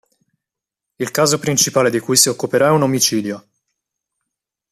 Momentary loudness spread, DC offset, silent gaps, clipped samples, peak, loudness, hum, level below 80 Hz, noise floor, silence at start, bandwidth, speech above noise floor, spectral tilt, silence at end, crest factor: 11 LU; under 0.1%; none; under 0.1%; 0 dBFS; -15 LUFS; none; -60 dBFS; -84 dBFS; 1 s; 15 kHz; 68 dB; -3 dB/octave; 1.35 s; 18 dB